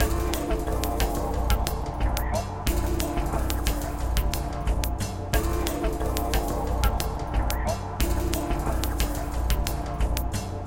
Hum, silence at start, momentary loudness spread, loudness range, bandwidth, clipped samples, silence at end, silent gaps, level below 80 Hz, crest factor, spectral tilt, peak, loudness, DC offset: none; 0 s; 3 LU; 1 LU; 17 kHz; under 0.1%; 0 s; none; -28 dBFS; 22 dB; -5 dB/octave; -2 dBFS; -28 LUFS; under 0.1%